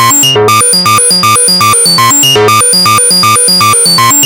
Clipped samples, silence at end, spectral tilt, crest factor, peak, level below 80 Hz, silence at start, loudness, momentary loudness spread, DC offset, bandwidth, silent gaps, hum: under 0.1%; 0 s; -1.5 dB/octave; 6 dB; 0 dBFS; -46 dBFS; 0 s; -3 LUFS; 1 LU; under 0.1%; 19 kHz; none; none